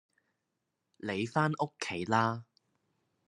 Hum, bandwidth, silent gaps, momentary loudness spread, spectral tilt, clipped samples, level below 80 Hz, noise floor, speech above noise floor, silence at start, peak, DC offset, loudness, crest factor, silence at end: none; 11 kHz; none; 10 LU; -5.5 dB/octave; under 0.1%; -76 dBFS; -84 dBFS; 52 dB; 1.05 s; -12 dBFS; under 0.1%; -32 LUFS; 24 dB; 0.85 s